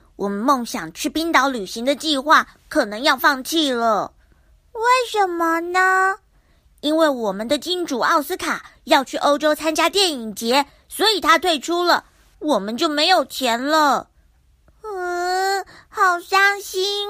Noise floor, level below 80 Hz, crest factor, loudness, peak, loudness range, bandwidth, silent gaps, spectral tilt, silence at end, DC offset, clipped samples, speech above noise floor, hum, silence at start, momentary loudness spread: -56 dBFS; -56 dBFS; 20 dB; -19 LUFS; 0 dBFS; 2 LU; 15.5 kHz; none; -2 dB/octave; 0 s; under 0.1%; under 0.1%; 37 dB; none; 0.2 s; 10 LU